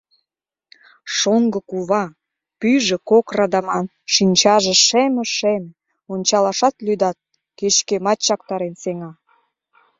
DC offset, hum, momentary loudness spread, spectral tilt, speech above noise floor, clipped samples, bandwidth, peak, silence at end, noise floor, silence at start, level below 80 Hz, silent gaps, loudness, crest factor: under 0.1%; none; 13 LU; -3 dB/octave; 65 dB; under 0.1%; 7.8 kHz; 0 dBFS; 0.9 s; -83 dBFS; 1.05 s; -62 dBFS; none; -17 LUFS; 18 dB